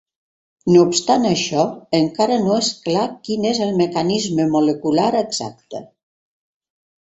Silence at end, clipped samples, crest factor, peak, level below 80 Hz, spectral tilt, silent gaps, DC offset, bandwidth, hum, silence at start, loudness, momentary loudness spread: 1.2 s; under 0.1%; 16 dB; -2 dBFS; -58 dBFS; -5 dB/octave; none; under 0.1%; 8.2 kHz; none; 0.65 s; -18 LUFS; 10 LU